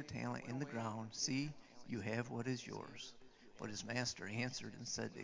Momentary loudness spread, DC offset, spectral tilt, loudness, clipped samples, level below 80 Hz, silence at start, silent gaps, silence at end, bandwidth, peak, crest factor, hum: 11 LU; under 0.1%; -4 dB/octave; -44 LUFS; under 0.1%; -72 dBFS; 0 s; none; 0 s; 7.6 kHz; -24 dBFS; 20 dB; none